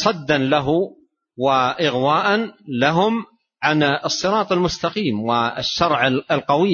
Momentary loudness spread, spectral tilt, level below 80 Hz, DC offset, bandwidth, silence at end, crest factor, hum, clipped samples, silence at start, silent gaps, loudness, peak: 5 LU; -5 dB/octave; -50 dBFS; under 0.1%; 7.2 kHz; 0 s; 18 dB; none; under 0.1%; 0 s; none; -19 LUFS; -2 dBFS